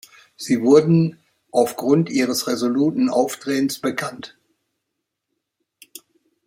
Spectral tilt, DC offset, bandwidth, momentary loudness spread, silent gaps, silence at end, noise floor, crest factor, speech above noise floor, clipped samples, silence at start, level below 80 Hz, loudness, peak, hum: -6 dB/octave; under 0.1%; 16.5 kHz; 13 LU; none; 2.2 s; -79 dBFS; 20 dB; 61 dB; under 0.1%; 0.4 s; -66 dBFS; -19 LUFS; -2 dBFS; none